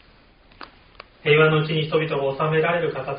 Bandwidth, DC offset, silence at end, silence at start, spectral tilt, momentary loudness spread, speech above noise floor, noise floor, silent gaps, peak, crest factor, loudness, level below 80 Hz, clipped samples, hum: 5.2 kHz; under 0.1%; 0 s; 0.6 s; -4 dB/octave; 8 LU; 33 dB; -53 dBFS; none; -4 dBFS; 18 dB; -20 LUFS; -56 dBFS; under 0.1%; none